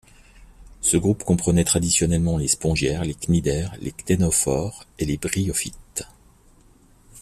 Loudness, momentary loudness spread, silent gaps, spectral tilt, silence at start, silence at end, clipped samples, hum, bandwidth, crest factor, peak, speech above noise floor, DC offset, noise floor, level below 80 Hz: -22 LUFS; 13 LU; none; -4.5 dB/octave; 0.4 s; 0 s; under 0.1%; none; 15 kHz; 18 dB; -6 dBFS; 32 dB; under 0.1%; -54 dBFS; -40 dBFS